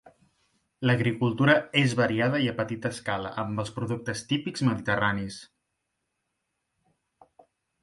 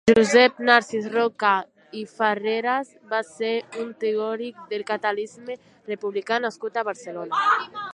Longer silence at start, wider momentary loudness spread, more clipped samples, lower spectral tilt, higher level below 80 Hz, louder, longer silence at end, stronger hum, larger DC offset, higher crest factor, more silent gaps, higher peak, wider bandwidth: about the same, 0.05 s vs 0.05 s; second, 10 LU vs 17 LU; neither; first, -6 dB/octave vs -3.5 dB/octave; about the same, -60 dBFS vs -64 dBFS; second, -27 LUFS vs -23 LUFS; first, 2.4 s vs 0.05 s; neither; neither; about the same, 22 dB vs 22 dB; neither; second, -8 dBFS vs -2 dBFS; about the same, 11.5 kHz vs 10.5 kHz